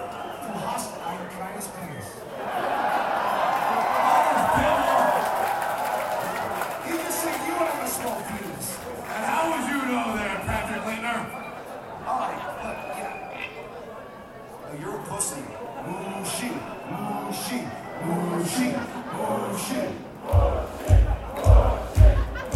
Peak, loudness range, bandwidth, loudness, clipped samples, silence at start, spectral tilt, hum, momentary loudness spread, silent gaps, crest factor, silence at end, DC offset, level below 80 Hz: -4 dBFS; 10 LU; 16.5 kHz; -26 LUFS; under 0.1%; 0 s; -5 dB/octave; none; 15 LU; none; 22 dB; 0 s; under 0.1%; -30 dBFS